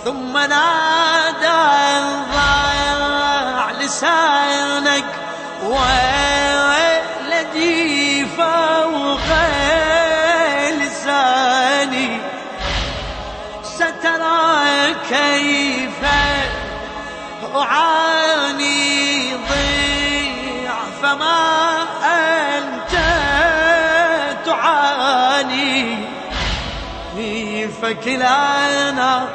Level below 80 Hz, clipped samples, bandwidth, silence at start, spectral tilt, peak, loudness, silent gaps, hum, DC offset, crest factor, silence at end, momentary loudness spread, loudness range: -36 dBFS; under 0.1%; 8.8 kHz; 0 s; -2.5 dB/octave; -2 dBFS; -16 LUFS; none; none; under 0.1%; 14 dB; 0 s; 10 LU; 3 LU